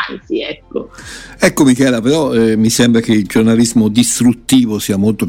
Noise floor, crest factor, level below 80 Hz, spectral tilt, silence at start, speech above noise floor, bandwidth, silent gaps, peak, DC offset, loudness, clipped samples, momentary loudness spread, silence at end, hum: -32 dBFS; 12 dB; -42 dBFS; -4.5 dB/octave; 0 s; 20 dB; 16.5 kHz; none; 0 dBFS; under 0.1%; -12 LUFS; under 0.1%; 14 LU; 0 s; none